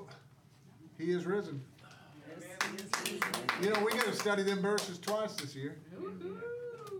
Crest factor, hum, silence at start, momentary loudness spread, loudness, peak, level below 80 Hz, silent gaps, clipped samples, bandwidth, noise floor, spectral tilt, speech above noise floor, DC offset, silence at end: 24 dB; none; 0 s; 18 LU; -35 LUFS; -14 dBFS; -82 dBFS; none; under 0.1%; 19 kHz; -60 dBFS; -4 dB/octave; 26 dB; under 0.1%; 0 s